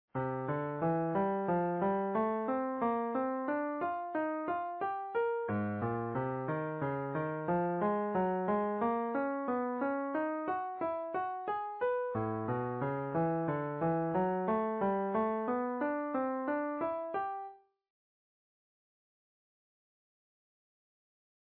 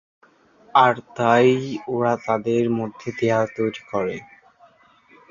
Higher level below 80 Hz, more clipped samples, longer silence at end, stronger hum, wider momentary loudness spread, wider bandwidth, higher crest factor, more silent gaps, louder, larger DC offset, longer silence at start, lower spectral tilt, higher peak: second, -70 dBFS vs -62 dBFS; neither; first, 3.95 s vs 1.05 s; neither; second, 4 LU vs 10 LU; second, 4.5 kHz vs 7.4 kHz; second, 14 dB vs 20 dB; neither; second, -35 LUFS vs -21 LUFS; neither; second, 0.15 s vs 0.75 s; about the same, -7.5 dB/octave vs -6.5 dB/octave; second, -20 dBFS vs -2 dBFS